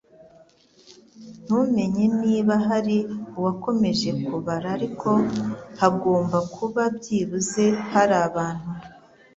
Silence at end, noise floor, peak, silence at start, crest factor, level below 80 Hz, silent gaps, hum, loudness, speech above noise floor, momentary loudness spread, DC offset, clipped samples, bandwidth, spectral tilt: 0.4 s; -55 dBFS; -2 dBFS; 0.9 s; 20 dB; -58 dBFS; none; none; -23 LUFS; 33 dB; 8 LU; under 0.1%; under 0.1%; 8 kHz; -6 dB/octave